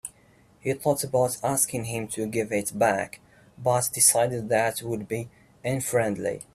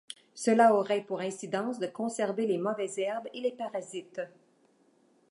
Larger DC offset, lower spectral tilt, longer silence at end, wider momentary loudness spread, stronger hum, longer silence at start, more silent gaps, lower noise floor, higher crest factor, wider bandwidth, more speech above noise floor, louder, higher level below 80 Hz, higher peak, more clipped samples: neither; about the same, -3.5 dB/octave vs -4.5 dB/octave; second, 0.1 s vs 1 s; about the same, 15 LU vs 17 LU; neither; about the same, 0.05 s vs 0.1 s; neither; second, -58 dBFS vs -66 dBFS; about the same, 20 dB vs 22 dB; first, 16 kHz vs 11.5 kHz; second, 33 dB vs 37 dB; first, -25 LUFS vs -30 LUFS; first, -60 dBFS vs -86 dBFS; first, -6 dBFS vs -10 dBFS; neither